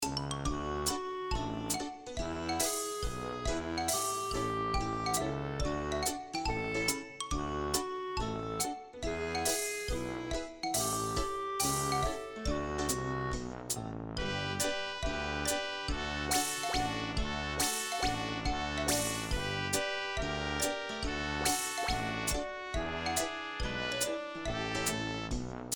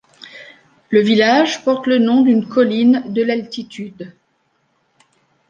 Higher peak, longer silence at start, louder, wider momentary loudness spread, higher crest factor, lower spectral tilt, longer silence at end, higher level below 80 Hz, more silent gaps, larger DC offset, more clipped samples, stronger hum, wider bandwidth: second, -16 dBFS vs -2 dBFS; second, 0 s vs 0.35 s; second, -34 LUFS vs -15 LUFS; second, 6 LU vs 21 LU; about the same, 18 dB vs 16 dB; second, -3 dB/octave vs -5.5 dB/octave; second, 0 s vs 1.45 s; first, -46 dBFS vs -66 dBFS; neither; neither; neither; neither; first, 18 kHz vs 7.4 kHz